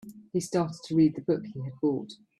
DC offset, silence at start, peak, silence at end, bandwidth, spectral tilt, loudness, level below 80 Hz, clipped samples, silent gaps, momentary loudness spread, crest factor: under 0.1%; 0.05 s; -12 dBFS; 0.25 s; 12.5 kHz; -7 dB/octave; -29 LUFS; -66 dBFS; under 0.1%; none; 10 LU; 16 dB